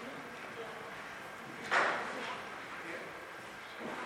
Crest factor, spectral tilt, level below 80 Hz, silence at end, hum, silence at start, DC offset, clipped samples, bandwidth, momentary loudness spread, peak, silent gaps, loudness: 24 dB; -3 dB/octave; -76 dBFS; 0 s; none; 0 s; under 0.1%; under 0.1%; 17 kHz; 15 LU; -16 dBFS; none; -39 LUFS